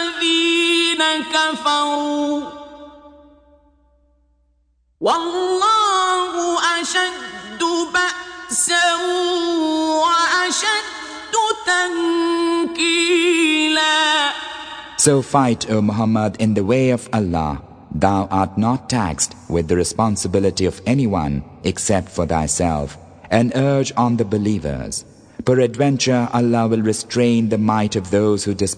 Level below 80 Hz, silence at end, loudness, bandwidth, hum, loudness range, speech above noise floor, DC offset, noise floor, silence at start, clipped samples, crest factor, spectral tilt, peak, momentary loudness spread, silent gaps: -44 dBFS; 0 s; -18 LUFS; 10 kHz; none; 4 LU; 44 dB; under 0.1%; -62 dBFS; 0 s; under 0.1%; 18 dB; -4 dB/octave; 0 dBFS; 9 LU; none